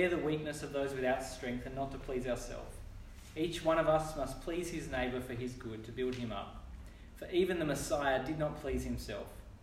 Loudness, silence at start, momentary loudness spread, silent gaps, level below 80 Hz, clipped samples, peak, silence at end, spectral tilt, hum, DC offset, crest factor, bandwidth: -37 LUFS; 0 s; 17 LU; none; -50 dBFS; under 0.1%; -18 dBFS; 0 s; -5 dB/octave; none; under 0.1%; 18 dB; 16 kHz